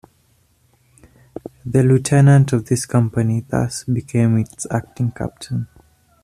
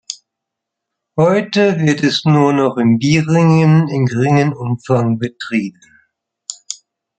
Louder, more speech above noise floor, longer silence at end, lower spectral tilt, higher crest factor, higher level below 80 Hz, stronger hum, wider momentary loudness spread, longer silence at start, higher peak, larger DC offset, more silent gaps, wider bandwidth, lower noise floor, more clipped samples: second, -18 LUFS vs -14 LUFS; second, 42 dB vs 67 dB; first, 0.6 s vs 0.45 s; about the same, -7 dB/octave vs -6.5 dB/octave; about the same, 16 dB vs 14 dB; first, -48 dBFS vs -56 dBFS; neither; about the same, 18 LU vs 18 LU; first, 1.65 s vs 0.1 s; about the same, -2 dBFS vs 0 dBFS; neither; neither; first, 13.5 kHz vs 9 kHz; second, -59 dBFS vs -80 dBFS; neither